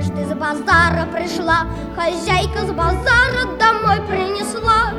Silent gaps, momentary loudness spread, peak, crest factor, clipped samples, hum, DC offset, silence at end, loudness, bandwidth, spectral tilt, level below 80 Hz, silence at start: none; 8 LU; 0 dBFS; 16 dB; under 0.1%; none; under 0.1%; 0 s; -17 LUFS; 14.5 kHz; -5 dB/octave; -30 dBFS; 0 s